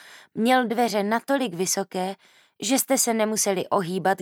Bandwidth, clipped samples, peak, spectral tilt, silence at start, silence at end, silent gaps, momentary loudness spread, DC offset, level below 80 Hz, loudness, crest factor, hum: 18.5 kHz; under 0.1%; -8 dBFS; -3 dB/octave; 0.05 s; 0 s; none; 10 LU; under 0.1%; -82 dBFS; -23 LUFS; 16 dB; none